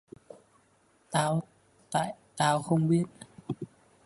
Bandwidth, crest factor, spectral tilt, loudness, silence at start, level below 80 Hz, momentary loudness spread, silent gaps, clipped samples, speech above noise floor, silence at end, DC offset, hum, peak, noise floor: 11.5 kHz; 20 dB; -5.5 dB/octave; -30 LUFS; 1.1 s; -68 dBFS; 20 LU; none; under 0.1%; 39 dB; 0.4 s; under 0.1%; none; -12 dBFS; -66 dBFS